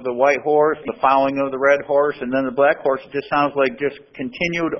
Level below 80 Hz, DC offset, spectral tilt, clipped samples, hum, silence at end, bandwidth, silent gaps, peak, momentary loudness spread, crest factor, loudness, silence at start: -56 dBFS; under 0.1%; -6 dB/octave; under 0.1%; none; 0 s; 6.4 kHz; none; -2 dBFS; 8 LU; 18 dB; -19 LUFS; 0 s